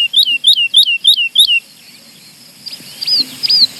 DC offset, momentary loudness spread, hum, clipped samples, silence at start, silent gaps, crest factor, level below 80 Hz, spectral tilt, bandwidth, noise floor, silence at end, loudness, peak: under 0.1%; 21 LU; none; under 0.1%; 0 s; none; 14 dB; -70 dBFS; 2 dB/octave; over 20 kHz; -40 dBFS; 0 s; -9 LUFS; 0 dBFS